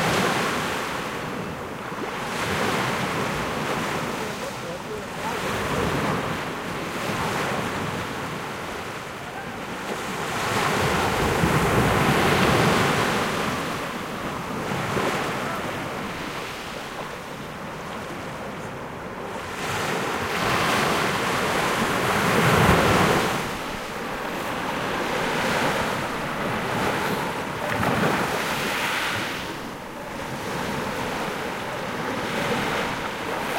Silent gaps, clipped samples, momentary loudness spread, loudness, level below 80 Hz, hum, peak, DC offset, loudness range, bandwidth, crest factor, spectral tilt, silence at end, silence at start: none; under 0.1%; 13 LU; -25 LUFS; -44 dBFS; none; -6 dBFS; under 0.1%; 8 LU; 16 kHz; 20 dB; -4.5 dB/octave; 0 s; 0 s